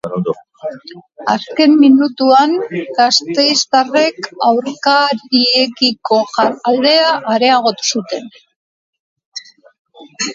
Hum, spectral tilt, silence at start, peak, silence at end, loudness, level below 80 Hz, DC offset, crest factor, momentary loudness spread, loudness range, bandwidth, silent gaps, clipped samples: none; -3 dB/octave; 0.05 s; 0 dBFS; 0 s; -13 LUFS; -64 dBFS; under 0.1%; 14 dB; 15 LU; 4 LU; 7.8 kHz; 8.56-8.93 s, 8.99-9.16 s, 9.26-9.32 s, 9.79-9.85 s; under 0.1%